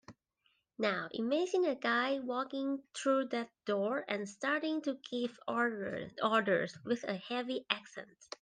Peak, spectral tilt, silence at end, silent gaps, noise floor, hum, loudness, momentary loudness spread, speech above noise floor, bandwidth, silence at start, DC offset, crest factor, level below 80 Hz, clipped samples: -12 dBFS; -4.5 dB/octave; 0.15 s; none; -77 dBFS; none; -35 LUFS; 7 LU; 42 dB; 9.8 kHz; 0.1 s; under 0.1%; 24 dB; -80 dBFS; under 0.1%